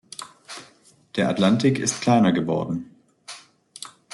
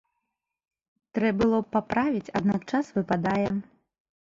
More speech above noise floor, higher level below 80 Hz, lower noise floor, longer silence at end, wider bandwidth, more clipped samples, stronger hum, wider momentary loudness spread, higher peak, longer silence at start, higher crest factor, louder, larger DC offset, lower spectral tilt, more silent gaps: second, 35 dB vs 57 dB; second, -64 dBFS vs -56 dBFS; second, -55 dBFS vs -83 dBFS; second, 0.25 s vs 0.7 s; first, 12 kHz vs 7.6 kHz; neither; neither; first, 22 LU vs 5 LU; first, -6 dBFS vs -10 dBFS; second, 0.2 s vs 1.15 s; about the same, 18 dB vs 18 dB; first, -21 LUFS vs -27 LUFS; neither; second, -5 dB/octave vs -7.5 dB/octave; neither